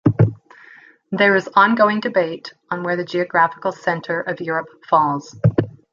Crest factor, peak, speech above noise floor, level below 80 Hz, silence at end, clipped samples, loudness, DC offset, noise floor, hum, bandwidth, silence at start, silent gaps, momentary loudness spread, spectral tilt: 18 dB; -2 dBFS; 28 dB; -52 dBFS; 0.25 s; under 0.1%; -19 LUFS; under 0.1%; -47 dBFS; none; 7.4 kHz; 0.05 s; none; 11 LU; -7.5 dB/octave